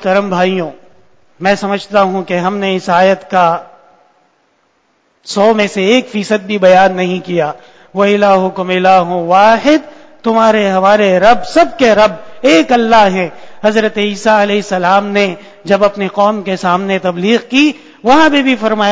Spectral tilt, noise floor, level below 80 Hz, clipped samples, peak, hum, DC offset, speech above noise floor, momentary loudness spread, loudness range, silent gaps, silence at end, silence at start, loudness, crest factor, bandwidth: -5 dB/octave; -57 dBFS; -50 dBFS; 0.6%; 0 dBFS; none; under 0.1%; 46 dB; 8 LU; 5 LU; none; 0 s; 0 s; -11 LUFS; 12 dB; 8 kHz